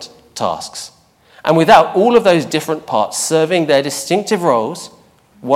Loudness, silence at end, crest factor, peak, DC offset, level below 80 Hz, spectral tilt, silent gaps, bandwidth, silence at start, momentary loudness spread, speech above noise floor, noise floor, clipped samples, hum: -14 LUFS; 0 s; 14 dB; 0 dBFS; under 0.1%; -54 dBFS; -4 dB/octave; none; 16.5 kHz; 0 s; 21 LU; 25 dB; -38 dBFS; under 0.1%; none